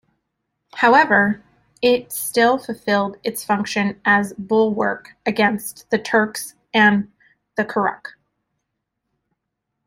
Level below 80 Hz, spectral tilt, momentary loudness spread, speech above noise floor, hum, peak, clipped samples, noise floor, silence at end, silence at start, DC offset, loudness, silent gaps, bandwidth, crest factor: -62 dBFS; -4.5 dB/octave; 13 LU; 60 dB; none; -2 dBFS; under 0.1%; -78 dBFS; 1.75 s; 0.75 s; under 0.1%; -19 LUFS; none; 16 kHz; 18 dB